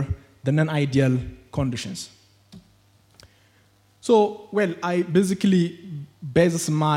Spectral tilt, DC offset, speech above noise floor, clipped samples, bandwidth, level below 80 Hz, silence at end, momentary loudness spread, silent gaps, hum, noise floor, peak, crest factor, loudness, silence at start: -6.5 dB/octave; under 0.1%; 38 dB; under 0.1%; 16 kHz; -50 dBFS; 0 s; 14 LU; none; none; -59 dBFS; -4 dBFS; 20 dB; -23 LUFS; 0 s